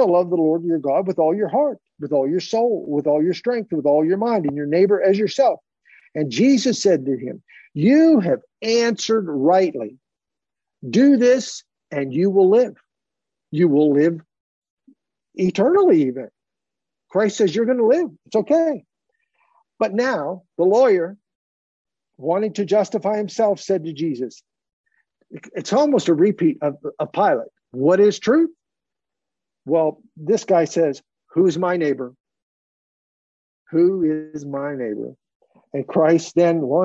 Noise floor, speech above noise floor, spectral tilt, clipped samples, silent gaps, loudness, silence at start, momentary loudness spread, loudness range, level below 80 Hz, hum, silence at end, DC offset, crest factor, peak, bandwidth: -87 dBFS; 69 dB; -6 dB/octave; under 0.1%; 14.40-14.62 s, 14.70-14.77 s, 21.35-21.85 s, 24.73-24.84 s, 32.20-32.24 s, 32.42-33.66 s, 35.35-35.40 s; -19 LUFS; 0 s; 14 LU; 4 LU; -72 dBFS; none; 0 s; under 0.1%; 14 dB; -4 dBFS; 8 kHz